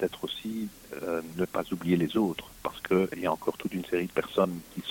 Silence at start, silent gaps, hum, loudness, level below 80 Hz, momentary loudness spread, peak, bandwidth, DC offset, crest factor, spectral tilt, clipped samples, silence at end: 0 s; none; none; -31 LUFS; -60 dBFS; 10 LU; -12 dBFS; 17 kHz; under 0.1%; 18 dB; -6 dB/octave; under 0.1%; 0 s